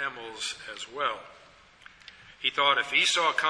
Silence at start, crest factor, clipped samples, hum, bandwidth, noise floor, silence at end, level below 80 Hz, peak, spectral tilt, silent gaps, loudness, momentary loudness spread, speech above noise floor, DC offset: 0 s; 20 dB; under 0.1%; none; 11 kHz; -54 dBFS; 0 s; -68 dBFS; -10 dBFS; 0 dB/octave; none; -26 LUFS; 15 LU; 26 dB; under 0.1%